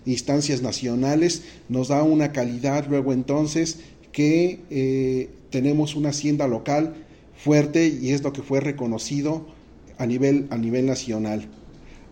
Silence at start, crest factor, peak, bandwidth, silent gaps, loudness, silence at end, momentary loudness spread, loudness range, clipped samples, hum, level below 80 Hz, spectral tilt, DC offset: 0.05 s; 16 dB; -6 dBFS; 16 kHz; none; -23 LUFS; 0.15 s; 9 LU; 2 LU; under 0.1%; none; -52 dBFS; -6 dB/octave; under 0.1%